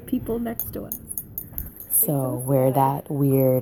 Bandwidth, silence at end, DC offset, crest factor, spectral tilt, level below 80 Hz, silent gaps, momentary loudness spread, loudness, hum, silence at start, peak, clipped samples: 17.5 kHz; 0 s; under 0.1%; 16 dB; -7 dB/octave; -48 dBFS; none; 13 LU; -23 LUFS; none; 0 s; -6 dBFS; under 0.1%